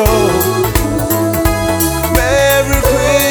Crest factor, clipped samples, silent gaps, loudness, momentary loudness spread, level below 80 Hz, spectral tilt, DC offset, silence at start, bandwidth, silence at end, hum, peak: 12 dB; under 0.1%; none; -12 LUFS; 4 LU; -22 dBFS; -4.5 dB/octave; under 0.1%; 0 s; over 20 kHz; 0 s; none; 0 dBFS